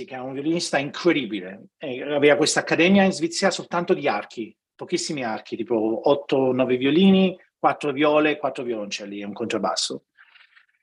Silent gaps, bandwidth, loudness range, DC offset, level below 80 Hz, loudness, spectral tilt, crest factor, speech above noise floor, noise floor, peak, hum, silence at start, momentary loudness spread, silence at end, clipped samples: none; 11.5 kHz; 4 LU; under 0.1%; -68 dBFS; -22 LUFS; -4.5 dB/octave; 18 dB; 33 dB; -55 dBFS; -4 dBFS; none; 0 s; 15 LU; 0.85 s; under 0.1%